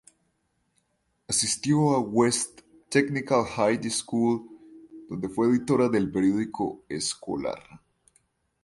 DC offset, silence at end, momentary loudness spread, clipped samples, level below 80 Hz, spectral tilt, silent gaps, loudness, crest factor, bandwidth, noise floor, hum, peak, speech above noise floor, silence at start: under 0.1%; 0.85 s; 9 LU; under 0.1%; -60 dBFS; -4.5 dB/octave; none; -26 LUFS; 20 dB; 11.5 kHz; -73 dBFS; none; -8 dBFS; 48 dB; 1.3 s